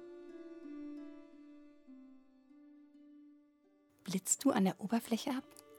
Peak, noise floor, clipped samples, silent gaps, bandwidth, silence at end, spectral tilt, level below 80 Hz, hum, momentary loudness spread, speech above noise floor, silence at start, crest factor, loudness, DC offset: -18 dBFS; -70 dBFS; under 0.1%; none; 18 kHz; 0 s; -4.5 dB/octave; -82 dBFS; none; 26 LU; 35 dB; 0 s; 22 dB; -36 LUFS; under 0.1%